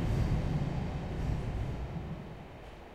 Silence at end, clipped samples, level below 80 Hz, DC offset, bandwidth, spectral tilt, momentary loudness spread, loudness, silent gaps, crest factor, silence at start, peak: 0 s; under 0.1%; -40 dBFS; under 0.1%; 13 kHz; -8 dB/octave; 15 LU; -36 LUFS; none; 14 dB; 0 s; -20 dBFS